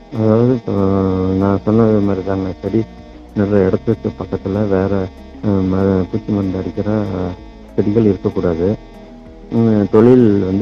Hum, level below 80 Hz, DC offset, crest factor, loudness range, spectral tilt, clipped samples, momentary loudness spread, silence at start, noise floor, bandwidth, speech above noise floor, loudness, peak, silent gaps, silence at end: none; -40 dBFS; under 0.1%; 14 dB; 3 LU; -10 dB/octave; under 0.1%; 10 LU; 0.1 s; -36 dBFS; 6.8 kHz; 21 dB; -16 LUFS; 0 dBFS; none; 0 s